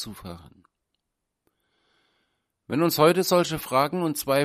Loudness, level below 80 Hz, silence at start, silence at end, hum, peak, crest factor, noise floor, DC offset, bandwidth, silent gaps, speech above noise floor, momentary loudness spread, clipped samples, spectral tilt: -23 LUFS; -60 dBFS; 0 s; 0 s; none; -4 dBFS; 22 dB; -82 dBFS; under 0.1%; 15.5 kHz; none; 59 dB; 17 LU; under 0.1%; -5 dB/octave